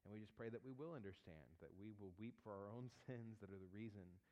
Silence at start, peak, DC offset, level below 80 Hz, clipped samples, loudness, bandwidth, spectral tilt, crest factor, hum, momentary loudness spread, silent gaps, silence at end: 0.05 s; -40 dBFS; under 0.1%; -82 dBFS; under 0.1%; -57 LUFS; 8.8 kHz; -8 dB/octave; 18 dB; none; 9 LU; none; 0 s